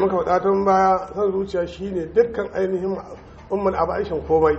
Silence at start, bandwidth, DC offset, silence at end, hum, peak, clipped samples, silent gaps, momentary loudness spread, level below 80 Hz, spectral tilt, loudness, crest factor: 0 s; 7.6 kHz; under 0.1%; 0 s; none; -4 dBFS; under 0.1%; none; 10 LU; -44 dBFS; -7.5 dB/octave; -21 LUFS; 16 dB